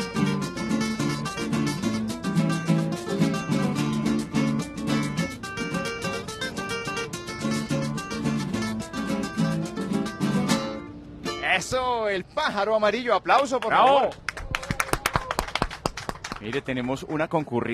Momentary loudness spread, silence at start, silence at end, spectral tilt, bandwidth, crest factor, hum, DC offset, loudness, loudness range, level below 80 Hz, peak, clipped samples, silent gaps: 8 LU; 0 s; 0 s; -5 dB/octave; 14 kHz; 22 dB; none; under 0.1%; -26 LUFS; 6 LU; -46 dBFS; -4 dBFS; under 0.1%; none